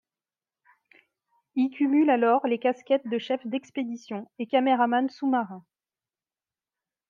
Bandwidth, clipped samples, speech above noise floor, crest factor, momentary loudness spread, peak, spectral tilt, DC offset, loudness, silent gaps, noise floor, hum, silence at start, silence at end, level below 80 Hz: 7.2 kHz; under 0.1%; over 65 dB; 18 dB; 13 LU; -10 dBFS; -6 dB/octave; under 0.1%; -26 LUFS; none; under -90 dBFS; none; 1.55 s; 1.5 s; -82 dBFS